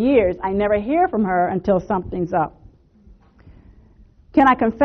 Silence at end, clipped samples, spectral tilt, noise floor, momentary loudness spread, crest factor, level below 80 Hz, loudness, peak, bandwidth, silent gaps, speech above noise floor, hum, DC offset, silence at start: 0 s; under 0.1%; -6 dB/octave; -50 dBFS; 7 LU; 16 dB; -44 dBFS; -19 LUFS; -4 dBFS; 6.4 kHz; none; 32 dB; none; under 0.1%; 0 s